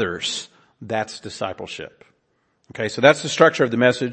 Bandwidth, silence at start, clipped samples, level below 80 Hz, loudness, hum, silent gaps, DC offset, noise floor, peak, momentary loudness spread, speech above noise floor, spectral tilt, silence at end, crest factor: 8.8 kHz; 0 s; under 0.1%; -62 dBFS; -20 LUFS; none; none; under 0.1%; -68 dBFS; 0 dBFS; 18 LU; 47 dB; -4 dB/octave; 0 s; 22 dB